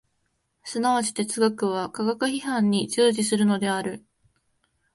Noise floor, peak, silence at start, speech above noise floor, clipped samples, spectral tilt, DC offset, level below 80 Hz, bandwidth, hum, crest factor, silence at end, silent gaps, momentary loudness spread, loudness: -73 dBFS; -8 dBFS; 0.65 s; 50 dB; under 0.1%; -4.5 dB/octave; under 0.1%; -68 dBFS; 11.5 kHz; none; 18 dB; 0.95 s; none; 10 LU; -24 LUFS